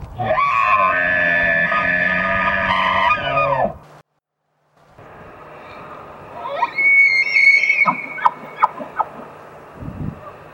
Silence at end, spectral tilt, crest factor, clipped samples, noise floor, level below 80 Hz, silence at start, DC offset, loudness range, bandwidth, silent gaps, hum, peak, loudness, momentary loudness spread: 0.05 s; -4.5 dB/octave; 18 dB; under 0.1%; -72 dBFS; -46 dBFS; 0 s; under 0.1%; 10 LU; 16.5 kHz; none; none; 0 dBFS; -15 LUFS; 25 LU